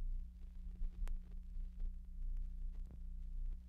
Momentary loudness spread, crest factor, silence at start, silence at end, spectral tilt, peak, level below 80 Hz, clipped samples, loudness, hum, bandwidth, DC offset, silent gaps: 5 LU; 10 dB; 0 s; 0 s; -7.5 dB/octave; -32 dBFS; -44 dBFS; under 0.1%; -52 LUFS; 60 Hz at -55 dBFS; 2.7 kHz; under 0.1%; none